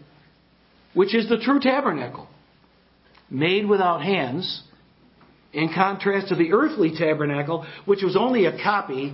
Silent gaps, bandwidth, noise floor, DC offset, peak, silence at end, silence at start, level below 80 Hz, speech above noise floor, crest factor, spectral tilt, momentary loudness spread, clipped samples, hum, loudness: none; 5.8 kHz; -58 dBFS; under 0.1%; -2 dBFS; 0 s; 0.95 s; -66 dBFS; 36 dB; 20 dB; -10.5 dB/octave; 10 LU; under 0.1%; none; -22 LUFS